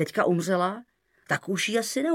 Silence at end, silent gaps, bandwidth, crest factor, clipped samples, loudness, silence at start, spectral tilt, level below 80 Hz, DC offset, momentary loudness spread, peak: 0 s; none; 16.5 kHz; 18 dB; under 0.1%; -26 LUFS; 0 s; -4.5 dB/octave; -76 dBFS; under 0.1%; 6 LU; -10 dBFS